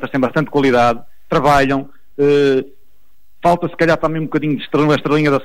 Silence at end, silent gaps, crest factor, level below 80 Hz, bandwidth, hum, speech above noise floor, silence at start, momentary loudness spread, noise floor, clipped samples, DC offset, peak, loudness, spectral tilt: 0 s; none; 12 dB; -40 dBFS; 15.5 kHz; none; 45 dB; 0 s; 7 LU; -60 dBFS; under 0.1%; 2%; -4 dBFS; -15 LUFS; -6.5 dB/octave